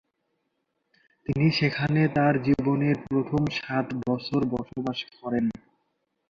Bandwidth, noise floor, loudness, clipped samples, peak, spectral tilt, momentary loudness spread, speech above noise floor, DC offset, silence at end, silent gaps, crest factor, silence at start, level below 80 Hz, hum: 7.2 kHz; -77 dBFS; -26 LUFS; under 0.1%; -10 dBFS; -8 dB/octave; 9 LU; 52 dB; under 0.1%; 0.8 s; none; 18 dB; 1.3 s; -56 dBFS; none